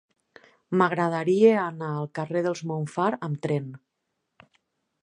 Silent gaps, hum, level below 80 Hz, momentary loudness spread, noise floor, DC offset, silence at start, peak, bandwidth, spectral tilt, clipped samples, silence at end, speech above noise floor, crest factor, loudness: none; none; -76 dBFS; 11 LU; -80 dBFS; under 0.1%; 0.7 s; -6 dBFS; 10.5 kHz; -7 dB/octave; under 0.1%; 1.25 s; 55 dB; 20 dB; -25 LUFS